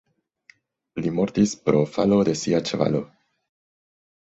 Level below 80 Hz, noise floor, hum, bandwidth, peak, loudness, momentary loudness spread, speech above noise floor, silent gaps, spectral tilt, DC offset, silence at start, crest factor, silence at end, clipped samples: -58 dBFS; -58 dBFS; none; 8.2 kHz; -4 dBFS; -22 LUFS; 9 LU; 36 dB; none; -6 dB/octave; under 0.1%; 0.95 s; 22 dB; 1.25 s; under 0.1%